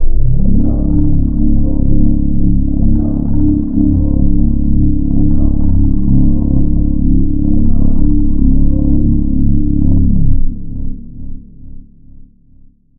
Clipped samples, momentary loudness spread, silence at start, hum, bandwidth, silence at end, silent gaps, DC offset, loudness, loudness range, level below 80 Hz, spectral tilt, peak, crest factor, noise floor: under 0.1%; 3 LU; 0 s; none; 1.1 kHz; 1.2 s; none; under 0.1%; -14 LUFS; 3 LU; -12 dBFS; -16.5 dB/octave; 0 dBFS; 8 dB; -42 dBFS